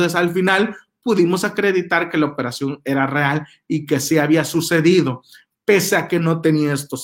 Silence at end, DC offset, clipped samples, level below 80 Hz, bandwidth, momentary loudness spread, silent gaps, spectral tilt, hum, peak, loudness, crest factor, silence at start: 0 s; under 0.1%; under 0.1%; -62 dBFS; 18 kHz; 9 LU; none; -5 dB/octave; none; -2 dBFS; -18 LUFS; 16 dB; 0 s